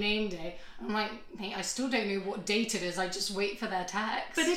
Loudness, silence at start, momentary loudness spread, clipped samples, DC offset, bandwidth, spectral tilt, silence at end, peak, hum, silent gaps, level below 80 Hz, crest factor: -33 LUFS; 0 s; 9 LU; under 0.1%; under 0.1%; 16.5 kHz; -3 dB/octave; 0 s; -16 dBFS; none; none; -56 dBFS; 18 dB